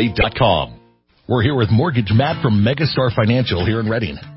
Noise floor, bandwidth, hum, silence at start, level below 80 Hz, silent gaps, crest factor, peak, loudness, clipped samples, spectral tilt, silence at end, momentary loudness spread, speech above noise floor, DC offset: -54 dBFS; 5.8 kHz; none; 0 s; -34 dBFS; none; 16 dB; 0 dBFS; -17 LUFS; under 0.1%; -11.5 dB/octave; 0 s; 5 LU; 37 dB; under 0.1%